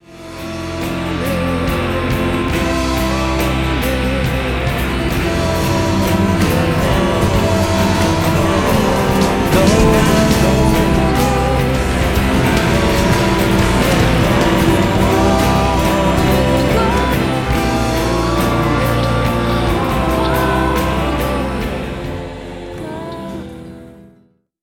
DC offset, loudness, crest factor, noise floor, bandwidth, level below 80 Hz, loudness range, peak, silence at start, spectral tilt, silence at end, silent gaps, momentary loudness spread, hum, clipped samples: under 0.1%; -15 LUFS; 14 dB; -53 dBFS; 19 kHz; -24 dBFS; 5 LU; 0 dBFS; 0.1 s; -5.5 dB/octave; 0.6 s; none; 11 LU; none; under 0.1%